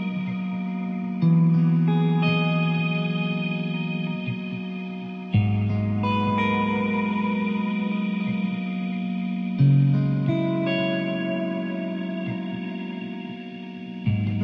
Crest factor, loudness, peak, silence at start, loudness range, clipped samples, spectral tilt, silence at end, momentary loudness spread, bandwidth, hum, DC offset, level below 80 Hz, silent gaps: 14 dB; -24 LUFS; -10 dBFS; 0 s; 5 LU; under 0.1%; -9.5 dB/octave; 0 s; 12 LU; 5.4 kHz; none; under 0.1%; -56 dBFS; none